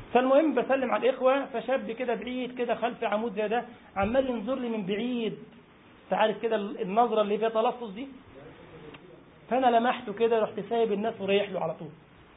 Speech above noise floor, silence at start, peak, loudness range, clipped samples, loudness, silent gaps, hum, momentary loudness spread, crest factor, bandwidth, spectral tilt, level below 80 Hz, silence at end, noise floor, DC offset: 27 dB; 0 s; -10 dBFS; 2 LU; under 0.1%; -28 LUFS; none; none; 17 LU; 18 dB; 4 kHz; -9.5 dB/octave; -60 dBFS; 0.4 s; -54 dBFS; under 0.1%